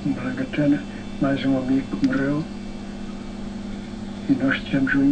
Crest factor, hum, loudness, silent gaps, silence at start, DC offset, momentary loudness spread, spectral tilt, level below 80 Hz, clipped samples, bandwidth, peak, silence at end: 16 dB; none; -24 LUFS; none; 0 s; under 0.1%; 12 LU; -7 dB/octave; -40 dBFS; under 0.1%; 9 kHz; -8 dBFS; 0 s